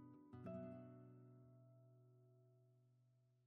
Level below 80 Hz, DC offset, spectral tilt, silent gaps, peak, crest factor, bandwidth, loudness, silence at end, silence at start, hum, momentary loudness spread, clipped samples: under -90 dBFS; under 0.1%; -9.5 dB/octave; none; -42 dBFS; 20 dB; 4.2 kHz; -59 LUFS; 0 s; 0 s; none; 14 LU; under 0.1%